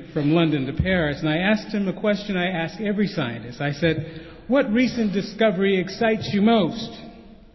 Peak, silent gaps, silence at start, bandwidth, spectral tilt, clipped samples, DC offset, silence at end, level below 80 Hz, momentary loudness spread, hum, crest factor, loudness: -6 dBFS; none; 0 s; 6.2 kHz; -7 dB/octave; under 0.1%; under 0.1%; 0.2 s; -44 dBFS; 9 LU; none; 16 dB; -22 LUFS